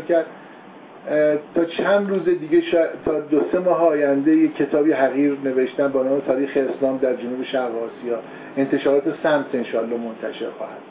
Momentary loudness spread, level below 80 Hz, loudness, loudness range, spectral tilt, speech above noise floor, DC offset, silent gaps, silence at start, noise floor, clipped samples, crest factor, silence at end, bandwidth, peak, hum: 11 LU; -62 dBFS; -21 LUFS; 4 LU; -10 dB/octave; 22 dB; under 0.1%; none; 0 s; -42 dBFS; under 0.1%; 16 dB; 0 s; 4 kHz; -6 dBFS; none